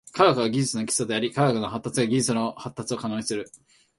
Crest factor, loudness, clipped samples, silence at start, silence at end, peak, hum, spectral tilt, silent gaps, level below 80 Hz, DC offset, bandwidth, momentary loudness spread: 20 dB; -25 LUFS; under 0.1%; 0.15 s; 0.5 s; -4 dBFS; none; -4.5 dB/octave; none; -62 dBFS; under 0.1%; 12 kHz; 11 LU